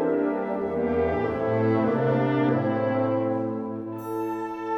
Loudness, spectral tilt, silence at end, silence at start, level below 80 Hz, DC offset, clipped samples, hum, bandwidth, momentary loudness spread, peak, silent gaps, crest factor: -25 LUFS; -9 dB/octave; 0 s; 0 s; -52 dBFS; under 0.1%; under 0.1%; none; 17.5 kHz; 8 LU; -12 dBFS; none; 14 dB